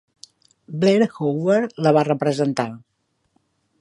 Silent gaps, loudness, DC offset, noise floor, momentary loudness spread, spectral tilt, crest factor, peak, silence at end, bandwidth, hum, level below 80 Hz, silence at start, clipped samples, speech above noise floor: none; -20 LUFS; under 0.1%; -67 dBFS; 8 LU; -7 dB/octave; 18 dB; -2 dBFS; 1 s; 11.5 kHz; none; -68 dBFS; 0.7 s; under 0.1%; 48 dB